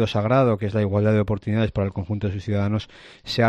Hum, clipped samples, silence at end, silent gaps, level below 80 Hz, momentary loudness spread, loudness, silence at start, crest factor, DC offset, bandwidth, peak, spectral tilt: none; under 0.1%; 0 s; none; -48 dBFS; 9 LU; -23 LUFS; 0 s; 14 dB; under 0.1%; 8 kHz; -8 dBFS; -8 dB/octave